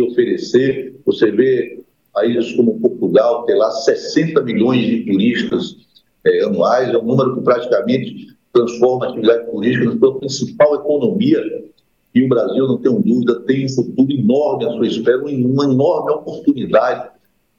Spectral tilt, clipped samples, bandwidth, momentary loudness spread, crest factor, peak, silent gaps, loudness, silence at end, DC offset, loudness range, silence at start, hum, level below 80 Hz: -6.5 dB/octave; under 0.1%; 7.4 kHz; 6 LU; 14 dB; -2 dBFS; none; -16 LUFS; 0.5 s; under 0.1%; 1 LU; 0 s; none; -62 dBFS